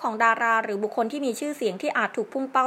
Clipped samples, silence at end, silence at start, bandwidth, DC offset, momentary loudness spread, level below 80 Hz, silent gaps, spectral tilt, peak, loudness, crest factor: under 0.1%; 0 s; 0 s; 16 kHz; under 0.1%; 7 LU; -84 dBFS; none; -4 dB/octave; -6 dBFS; -25 LUFS; 20 dB